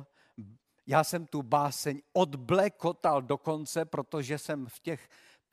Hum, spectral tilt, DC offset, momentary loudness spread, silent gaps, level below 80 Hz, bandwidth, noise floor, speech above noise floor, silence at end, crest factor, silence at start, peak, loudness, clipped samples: none; -5 dB/octave; under 0.1%; 12 LU; none; -72 dBFS; 15.5 kHz; -51 dBFS; 20 dB; 0.55 s; 22 dB; 0 s; -10 dBFS; -31 LUFS; under 0.1%